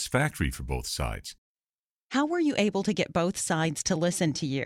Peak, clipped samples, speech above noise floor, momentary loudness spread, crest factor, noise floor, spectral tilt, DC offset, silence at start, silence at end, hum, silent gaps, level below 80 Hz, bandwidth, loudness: -10 dBFS; under 0.1%; over 62 dB; 7 LU; 18 dB; under -90 dBFS; -4.5 dB/octave; under 0.1%; 0 s; 0 s; none; 1.38-1.57 s, 1.69-2.10 s; -44 dBFS; 17 kHz; -28 LUFS